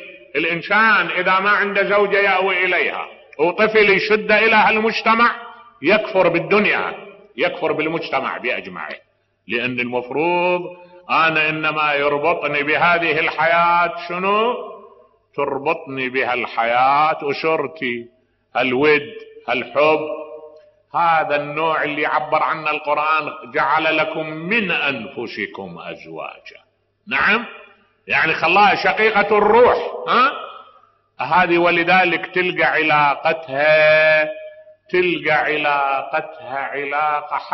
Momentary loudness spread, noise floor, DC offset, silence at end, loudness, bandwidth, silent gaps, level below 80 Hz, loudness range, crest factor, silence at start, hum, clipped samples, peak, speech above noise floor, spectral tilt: 14 LU; -53 dBFS; under 0.1%; 0 s; -17 LUFS; 6 kHz; none; -58 dBFS; 6 LU; 14 dB; 0 s; none; under 0.1%; -4 dBFS; 35 dB; -1.5 dB/octave